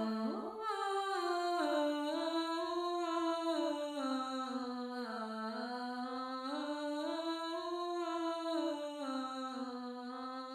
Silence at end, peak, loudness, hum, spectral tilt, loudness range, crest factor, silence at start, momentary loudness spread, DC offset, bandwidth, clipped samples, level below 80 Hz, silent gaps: 0 s; -24 dBFS; -39 LUFS; none; -4 dB/octave; 4 LU; 14 dB; 0 s; 6 LU; under 0.1%; 16 kHz; under 0.1%; -82 dBFS; none